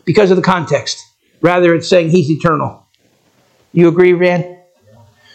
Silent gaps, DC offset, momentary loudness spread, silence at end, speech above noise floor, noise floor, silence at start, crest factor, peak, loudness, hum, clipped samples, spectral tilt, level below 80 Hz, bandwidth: none; under 0.1%; 11 LU; 0.8 s; 45 dB; -56 dBFS; 0.05 s; 14 dB; 0 dBFS; -12 LUFS; none; under 0.1%; -6.5 dB/octave; -50 dBFS; 8.8 kHz